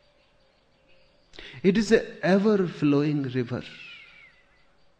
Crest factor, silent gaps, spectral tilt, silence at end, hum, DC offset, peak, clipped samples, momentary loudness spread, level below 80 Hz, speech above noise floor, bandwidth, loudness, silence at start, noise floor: 20 dB; none; -7 dB/octave; 1 s; none; under 0.1%; -6 dBFS; under 0.1%; 22 LU; -56 dBFS; 39 dB; 9.4 kHz; -24 LUFS; 1.35 s; -63 dBFS